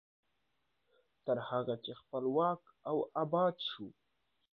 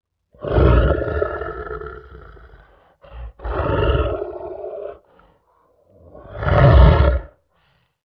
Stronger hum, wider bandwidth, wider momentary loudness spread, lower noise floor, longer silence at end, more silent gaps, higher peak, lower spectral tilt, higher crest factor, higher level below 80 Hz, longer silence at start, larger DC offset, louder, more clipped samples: neither; first, 5.8 kHz vs 5.2 kHz; second, 10 LU vs 23 LU; first, -83 dBFS vs -62 dBFS; second, 0.65 s vs 0.8 s; neither; second, -20 dBFS vs 0 dBFS; second, -4.5 dB/octave vs -10 dB/octave; about the same, 18 dB vs 18 dB; second, -84 dBFS vs -22 dBFS; first, 1.25 s vs 0.4 s; neither; second, -36 LUFS vs -18 LUFS; neither